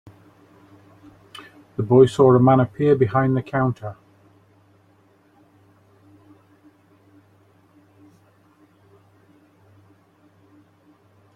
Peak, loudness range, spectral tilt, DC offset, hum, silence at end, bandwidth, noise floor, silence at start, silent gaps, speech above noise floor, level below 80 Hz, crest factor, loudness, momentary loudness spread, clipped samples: -2 dBFS; 12 LU; -8.5 dB/octave; under 0.1%; none; 7.45 s; 9.8 kHz; -57 dBFS; 1.8 s; none; 41 dB; -58 dBFS; 22 dB; -18 LUFS; 28 LU; under 0.1%